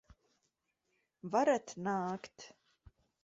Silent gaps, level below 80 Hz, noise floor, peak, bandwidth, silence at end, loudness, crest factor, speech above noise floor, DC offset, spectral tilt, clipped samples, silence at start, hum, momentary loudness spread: none; -72 dBFS; -83 dBFS; -18 dBFS; 7.6 kHz; 0.75 s; -35 LUFS; 20 dB; 48 dB; under 0.1%; -5 dB/octave; under 0.1%; 1.25 s; none; 22 LU